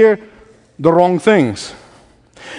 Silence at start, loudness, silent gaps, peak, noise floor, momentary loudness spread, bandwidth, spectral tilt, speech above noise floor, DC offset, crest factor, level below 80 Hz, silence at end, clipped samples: 0 s; -14 LUFS; none; 0 dBFS; -47 dBFS; 14 LU; 10.5 kHz; -6 dB/octave; 34 dB; under 0.1%; 16 dB; -54 dBFS; 0 s; under 0.1%